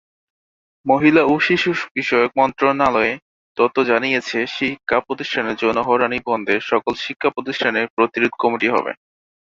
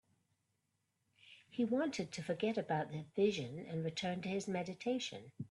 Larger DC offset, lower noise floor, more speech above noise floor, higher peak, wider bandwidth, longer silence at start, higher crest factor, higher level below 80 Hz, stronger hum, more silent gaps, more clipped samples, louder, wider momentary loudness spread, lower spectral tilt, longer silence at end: neither; first, under -90 dBFS vs -84 dBFS; first, over 72 dB vs 45 dB; first, 0 dBFS vs -22 dBFS; second, 7.6 kHz vs 11.5 kHz; second, 0.85 s vs 1.25 s; about the same, 18 dB vs 18 dB; first, -56 dBFS vs -78 dBFS; neither; first, 1.91-1.95 s, 3.22-3.55 s, 7.90-7.97 s vs none; neither; first, -18 LUFS vs -39 LUFS; about the same, 7 LU vs 8 LU; about the same, -5.5 dB/octave vs -5.5 dB/octave; first, 0.6 s vs 0.05 s